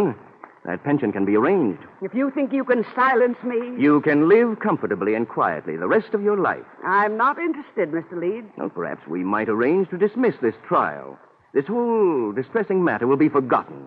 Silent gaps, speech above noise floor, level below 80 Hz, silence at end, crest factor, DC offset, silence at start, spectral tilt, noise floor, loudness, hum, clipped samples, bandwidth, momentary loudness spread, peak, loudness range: none; 25 dB; -70 dBFS; 0 s; 16 dB; under 0.1%; 0 s; -10 dB/octave; -45 dBFS; -21 LUFS; none; under 0.1%; 5 kHz; 11 LU; -4 dBFS; 4 LU